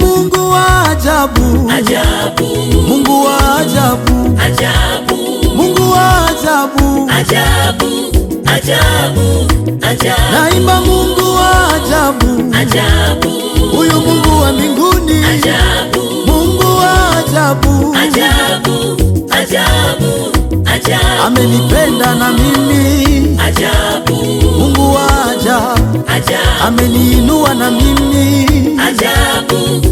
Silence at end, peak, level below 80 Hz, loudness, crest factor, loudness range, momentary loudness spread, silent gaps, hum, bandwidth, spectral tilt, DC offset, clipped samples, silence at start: 0 s; 0 dBFS; -18 dBFS; -10 LUFS; 10 dB; 1 LU; 4 LU; none; none; 17.5 kHz; -4.5 dB/octave; under 0.1%; under 0.1%; 0 s